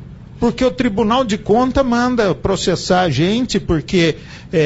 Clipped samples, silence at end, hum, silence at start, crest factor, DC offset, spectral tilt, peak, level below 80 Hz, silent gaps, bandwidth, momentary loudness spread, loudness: under 0.1%; 0 s; none; 0 s; 12 dB; under 0.1%; -5.5 dB/octave; -4 dBFS; -34 dBFS; none; 8 kHz; 3 LU; -16 LUFS